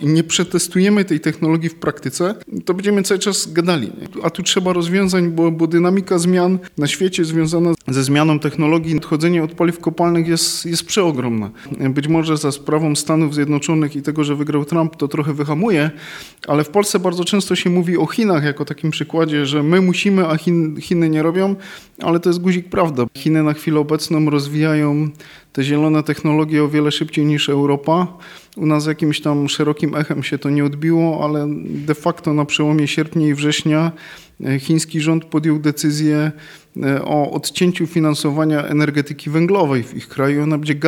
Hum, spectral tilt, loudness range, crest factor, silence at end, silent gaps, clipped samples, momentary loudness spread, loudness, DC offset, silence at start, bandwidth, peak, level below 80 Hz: none; -5.5 dB/octave; 2 LU; 16 dB; 0 s; none; under 0.1%; 6 LU; -17 LUFS; under 0.1%; 0 s; 17 kHz; -2 dBFS; -56 dBFS